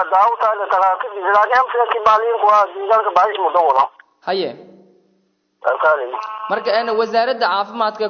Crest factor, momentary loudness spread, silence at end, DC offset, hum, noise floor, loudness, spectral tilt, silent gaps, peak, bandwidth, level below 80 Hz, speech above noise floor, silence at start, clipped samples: 14 dB; 9 LU; 0 s; under 0.1%; none; -63 dBFS; -16 LUFS; -4 dB/octave; none; -4 dBFS; 6.6 kHz; -64 dBFS; 47 dB; 0 s; under 0.1%